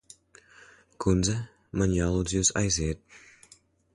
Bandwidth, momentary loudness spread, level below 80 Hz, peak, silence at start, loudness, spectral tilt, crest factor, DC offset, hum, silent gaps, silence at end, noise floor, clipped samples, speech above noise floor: 11.5 kHz; 10 LU; -42 dBFS; -10 dBFS; 1 s; -27 LUFS; -4.5 dB/octave; 18 dB; under 0.1%; none; none; 0.75 s; -60 dBFS; under 0.1%; 33 dB